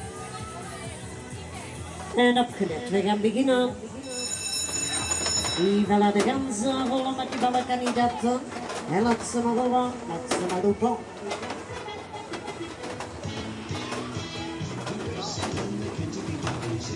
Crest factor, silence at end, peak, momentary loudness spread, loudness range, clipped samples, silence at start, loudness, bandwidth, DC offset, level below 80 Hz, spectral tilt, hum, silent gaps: 16 dB; 0 s; -10 dBFS; 14 LU; 9 LU; under 0.1%; 0 s; -27 LUFS; 11.5 kHz; under 0.1%; -56 dBFS; -4 dB/octave; none; none